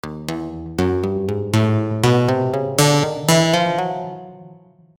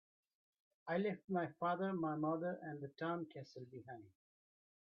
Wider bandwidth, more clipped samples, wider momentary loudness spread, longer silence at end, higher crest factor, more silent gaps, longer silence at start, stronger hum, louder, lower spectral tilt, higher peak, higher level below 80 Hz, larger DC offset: first, over 20 kHz vs 6.4 kHz; neither; about the same, 12 LU vs 14 LU; second, 0.45 s vs 0.75 s; about the same, 16 dB vs 18 dB; second, none vs 1.24-1.28 s; second, 0.05 s vs 0.85 s; neither; first, -18 LUFS vs -42 LUFS; about the same, -5 dB/octave vs -6 dB/octave; first, -2 dBFS vs -26 dBFS; first, -48 dBFS vs -86 dBFS; first, 0.1% vs under 0.1%